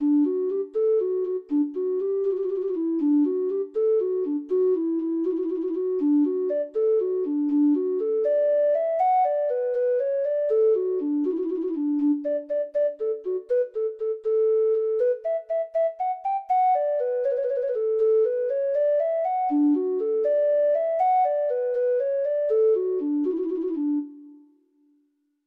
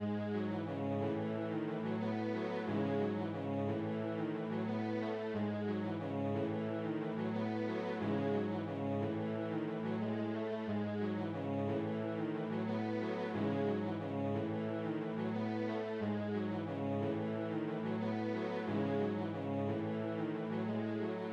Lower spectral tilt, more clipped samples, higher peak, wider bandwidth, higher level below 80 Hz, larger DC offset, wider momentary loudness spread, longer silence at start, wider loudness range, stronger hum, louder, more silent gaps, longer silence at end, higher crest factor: about the same, -8 dB/octave vs -8.5 dB/octave; neither; first, -14 dBFS vs -24 dBFS; second, 3.9 kHz vs 6.8 kHz; first, -74 dBFS vs -82 dBFS; neither; first, 6 LU vs 3 LU; about the same, 0 s vs 0 s; about the same, 2 LU vs 1 LU; neither; first, -24 LUFS vs -38 LUFS; neither; first, 1.1 s vs 0 s; about the same, 10 dB vs 14 dB